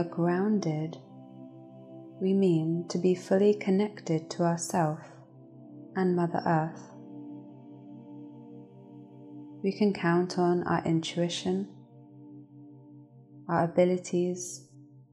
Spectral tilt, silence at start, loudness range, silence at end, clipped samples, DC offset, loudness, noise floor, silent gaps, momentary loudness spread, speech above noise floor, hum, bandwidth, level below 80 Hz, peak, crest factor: -6.5 dB/octave; 0 s; 6 LU; 0.3 s; under 0.1%; under 0.1%; -28 LUFS; -52 dBFS; none; 24 LU; 25 dB; none; 13 kHz; -74 dBFS; -12 dBFS; 18 dB